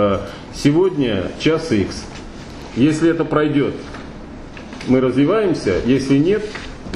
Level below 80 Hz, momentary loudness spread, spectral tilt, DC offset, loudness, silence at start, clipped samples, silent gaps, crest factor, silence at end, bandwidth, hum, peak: -38 dBFS; 19 LU; -6.5 dB/octave; under 0.1%; -17 LUFS; 0 s; under 0.1%; none; 16 dB; 0 s; 11.5 kHz; none; -2 dBFS